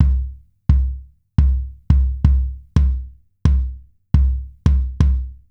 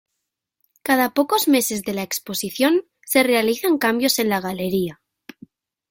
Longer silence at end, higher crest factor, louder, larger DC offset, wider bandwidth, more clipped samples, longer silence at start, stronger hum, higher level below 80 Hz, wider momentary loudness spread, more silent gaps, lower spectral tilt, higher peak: second, 0.15 s vs 1 s; about the same, 16 dB vs 18 dB; about the same, -20 LUFS vs -20 LUFS; neither; second, 5.8 kHz vs 17 kHz; neither; second, 0 s vs 0.85 s; neither; first, -18 dBFS vs -62 dBFS; about the same, 8 LU vs 8 LU; neither; first, -9 dB/octave vs -3.5 dB/octave; about the same, -2 dBFS vs -2 dBFS